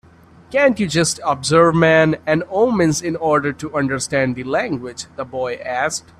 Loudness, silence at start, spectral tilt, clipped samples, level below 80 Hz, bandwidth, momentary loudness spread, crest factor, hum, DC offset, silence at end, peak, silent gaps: -17 LUFS; 0.5 s; -4.5 dB/octave; under 0.1%; -52 dBFS; 13.5 kHz; 11 LU; 18 dB; none; under 0.1%; 0.2 s; 0 dBFS; none